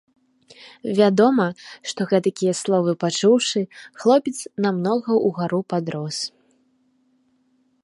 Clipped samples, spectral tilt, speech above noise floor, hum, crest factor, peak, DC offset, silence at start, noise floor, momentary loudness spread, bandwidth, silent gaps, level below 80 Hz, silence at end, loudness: under 0.1%; -5 dB/octave; 44 dB; none; 18 dB; -4 dBFS; under 0.1%; 0.6 s; -64 dBFS; 11 LU; 11.5 kHz; none; -70 dBFS; 1.55 s; -21 LUFS